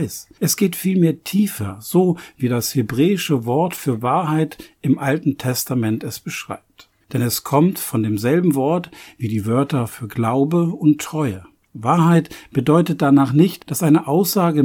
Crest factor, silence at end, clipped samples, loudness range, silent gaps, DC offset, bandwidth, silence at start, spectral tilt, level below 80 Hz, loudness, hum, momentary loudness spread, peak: 16 dB; 0 s; under 0.1%; 4 LU; none; under 0.1%; 19 kHz; 0 s; -6 dB/octave; -58 dBFS; -19 LUFS; none; 10 LU; -2 dBFS